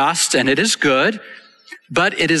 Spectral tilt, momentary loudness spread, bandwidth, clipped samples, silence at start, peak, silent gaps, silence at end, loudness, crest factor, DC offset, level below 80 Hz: -2.5 dB/octave; 6 LU; 12.5 kHz; under 0.1%; 0 s; -4 dBFS; none; 0 s; -16 LUFS; 14 dB; under 0.1%; -56 dBFS